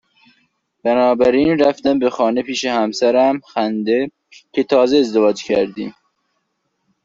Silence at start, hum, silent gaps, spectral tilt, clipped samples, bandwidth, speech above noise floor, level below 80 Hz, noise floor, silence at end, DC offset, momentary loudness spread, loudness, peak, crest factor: 0.85 s; none; none; -5 dB/octave; under 0.1%; 7.8 kHz; 55 dB; -54 dBFS; -70 dBFS; 1.15 s; under 0.1%; 10 LU; -16 LUFS; -2 dBFS; 14 dB